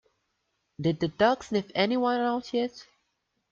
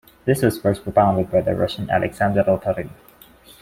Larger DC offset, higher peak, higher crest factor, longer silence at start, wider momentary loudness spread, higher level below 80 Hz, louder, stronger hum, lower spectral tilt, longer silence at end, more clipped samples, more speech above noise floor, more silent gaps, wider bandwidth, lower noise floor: neither; second, -8 dBFS vs -2 dBFS; about the same, 20 dB vs 18 dB; first, 0.8 s vs 0.25 s; about the same, 6 LU vs 6 LU; second, -64 dBFS vs -46 dBFS; second, -27 LUFS vs -20 LUFS; neither; about the same, -6 dB/octave vs -6.5 dB/octave; about the same, 0.7 s vs 0.7 s; neither; first, 51 dB vs 29 dB; neither; second, 7.6 kHz vs 16.5 kHz; first, -78 dBFS vs -48 dBFS